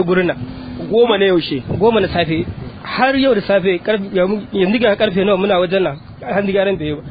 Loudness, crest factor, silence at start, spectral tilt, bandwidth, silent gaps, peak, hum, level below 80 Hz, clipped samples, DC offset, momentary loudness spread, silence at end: -16 LUFS; 14 dB; 0 s; -9.5 dB/octave; 5 kHz; none; 0 dBFS; none; -42 dBFS; under 0.1%; under 0.1%; 9 LU; 0 s